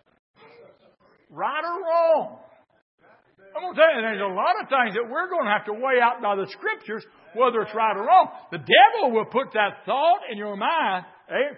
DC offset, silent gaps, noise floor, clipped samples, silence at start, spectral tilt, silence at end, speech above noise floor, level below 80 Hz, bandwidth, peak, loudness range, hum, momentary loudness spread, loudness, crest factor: under 0.1%; 2.82-2.98 s; -59 dBFS; under 0.1%; 1.35 s; -8 dB/octave; 0 s; 37 dB; -82 dBFS; 5.8 kHz; -2 dBFS; 6 LU; none; 13 LU; -22 LUFS; 22 dB